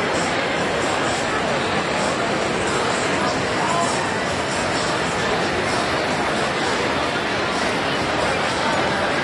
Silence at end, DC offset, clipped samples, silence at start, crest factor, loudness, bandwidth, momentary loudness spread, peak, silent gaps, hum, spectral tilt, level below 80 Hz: 0 s; under 0.1%; under 0.1%; 0 s; 14 dB; -20 LUFS; 11.5 kHz; 1 LU; -8 dBFS; none; none; -3.5 dB/octave; -46 dBFS